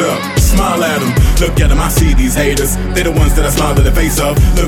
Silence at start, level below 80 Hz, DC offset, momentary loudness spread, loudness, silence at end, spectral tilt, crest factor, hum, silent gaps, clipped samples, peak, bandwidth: 0 s; -14 dBFS; under 0.1%; 2 LU; -12 LUFS; 0 s; -5 dB/octave; 10 dB; none; none; under 0.1%; 0 dBFS; 17.5 kHz